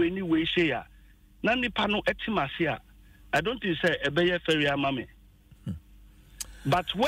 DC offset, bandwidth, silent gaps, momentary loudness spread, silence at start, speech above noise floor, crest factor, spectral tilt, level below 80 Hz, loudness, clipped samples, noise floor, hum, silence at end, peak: under 0.1%; 16 kHz; none; 15 LU; 0 s; 28 dB; 16 dB; -5 dB/octave; -52 dBFS; -27 LUFS; under 0.1%; -55 dBFS; none; 0 s; -14 dBFS